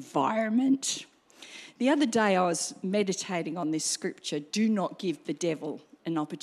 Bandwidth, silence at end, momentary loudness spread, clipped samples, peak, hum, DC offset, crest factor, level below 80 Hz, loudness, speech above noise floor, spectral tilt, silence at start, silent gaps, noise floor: 14 kHz; 0.05 s; 11 LU; under 0.1%; -12 dBFS; none; under 0.1%; 18 dB; -82 dBFS; -29 LUFS; 22 dB; -4 dB/octave; 0 s; none; -50 dBFS